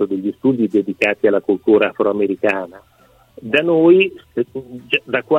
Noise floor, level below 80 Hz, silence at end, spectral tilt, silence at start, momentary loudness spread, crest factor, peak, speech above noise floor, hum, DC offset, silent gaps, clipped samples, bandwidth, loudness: -50 dBFS; -60 dBFS; 0 s; -7 dB/octave; 0 s; 12 LU; 16 dB; -2 dBFS; 33 dB; none; under 0.1%; none; under 0.1%; 8.2 kHz; -16 LUFS